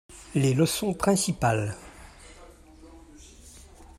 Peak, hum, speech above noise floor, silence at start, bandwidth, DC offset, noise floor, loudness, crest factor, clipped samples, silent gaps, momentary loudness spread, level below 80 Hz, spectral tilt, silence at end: -8 dBFS; none; 26 dB; 0.1 s; 15 kHz; under 0.1%; -50 dBFS; -25 LUFS; 20 dB; under 0.1%; none; 25 LU; -50 dBFS; -5 dB/octave; 0.15 s